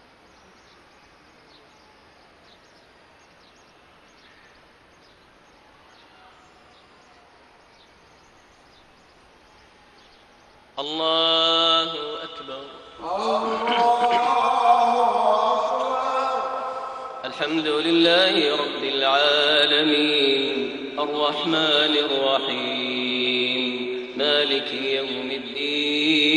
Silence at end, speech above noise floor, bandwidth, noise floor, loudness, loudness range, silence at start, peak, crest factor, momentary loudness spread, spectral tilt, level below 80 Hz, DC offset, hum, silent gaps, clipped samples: 0 s; 32 dB; 10.5 kHz; -53 dBFS; -21 LUFS; 4 LU; 10.75 s; -6 dBFS; 18 dB; 13 LU; -3.5 dB/octave; -66 dBFS; under 0.1%; none; none; under 0.1%